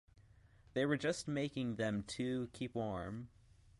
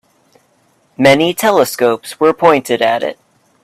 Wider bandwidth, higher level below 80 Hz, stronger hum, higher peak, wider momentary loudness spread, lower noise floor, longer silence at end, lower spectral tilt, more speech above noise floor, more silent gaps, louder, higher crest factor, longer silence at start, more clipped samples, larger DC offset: second, 11.5 kHz vs 16 kHz; second, -64 dBFS vs -56 dBFS; neither; second, -22 dBFS vs 0 dBFS; first, 9 LU vs 5 LU; first, -65 dBFS vs -56 dBFS; about the same, 0.5 s vs 0.5 s; about the same, -5.5 dB/octave vs -4.5 dB/octave; second, 26 dB vs 44 dB; neither; second, -40 LUFS vs -13 LUFS; first, 20 dB vs 14 dB; second, 0.15 s vs 1 s; neither; neither